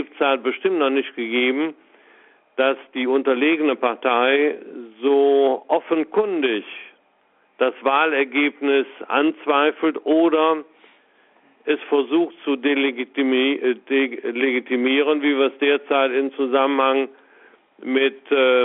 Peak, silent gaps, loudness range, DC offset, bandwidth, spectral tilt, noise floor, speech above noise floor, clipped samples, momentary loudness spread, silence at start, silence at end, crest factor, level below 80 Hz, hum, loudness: -4 dBFS; none; 2 LU; under 0.1%; 4 kHz; -0.5 dB/octave; -61 dBFS; 41 dB; under 0.1%; 7 LU; 0 s; 0 s; 16 dB; -72 dBFS; none; -20 LUFS